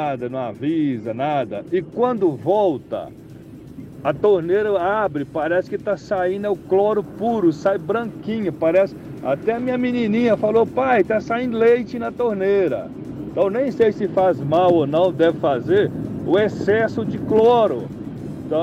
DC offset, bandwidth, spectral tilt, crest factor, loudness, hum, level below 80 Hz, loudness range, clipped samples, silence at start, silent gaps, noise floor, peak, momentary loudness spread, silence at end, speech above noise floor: under 0.1%; 9.6 kHz; -8 dB/octave; 12 dB; -20 LUFS; none; -52 dBFS; 3 LU; under 0.1%; 0 s; none; -39 dBFS; -6 dBFS; 11 LU; 0 s; 20 dB